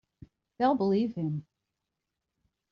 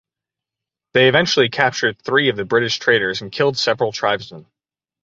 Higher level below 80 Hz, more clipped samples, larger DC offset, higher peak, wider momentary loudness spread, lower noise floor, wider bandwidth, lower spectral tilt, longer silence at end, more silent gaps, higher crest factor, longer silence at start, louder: second, -70 dBFS vs -58 dBFS; neither; neither; second, -14 dBFS vs 0 dBFS; about the same, 9 LU vs 7 LU; about the same, -86 dBFS vs -89 dBFS; second, 6.6 kHz vs 7.8 kHz; first, -7 dB/octave vs -4 dB/octave; first, 1.3 s vs 0.65 s; neither; about the same, 18 dB vs 18 dB; second, 0.6 s vs 0.95 s; second, -29 LUFS vs -17 LUFS